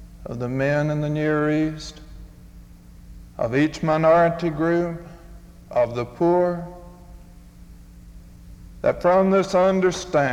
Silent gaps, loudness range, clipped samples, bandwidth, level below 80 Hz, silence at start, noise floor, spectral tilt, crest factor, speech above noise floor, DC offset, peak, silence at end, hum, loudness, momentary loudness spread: none; 5 LU; under 0.1%; 14 kHz; -46 dBFS; 0 s; -44 dBFS; -7 dB/octave; 16 dB; 24 dB; under 0.1%; -6 dBFS; 0 s; none; -21 LUFS; 18 LU